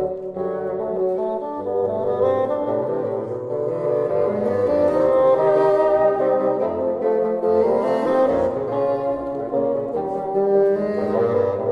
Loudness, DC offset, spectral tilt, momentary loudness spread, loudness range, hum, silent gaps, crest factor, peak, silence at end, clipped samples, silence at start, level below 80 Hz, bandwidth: -20 LUFS; under 0.1%; -8.5 dB/octave; 8 LU; 4 LU; none; none; 14 dB; -6 dBFS; 0 s; under 0.1%; 0 s; -54 dBFS; 6 kHz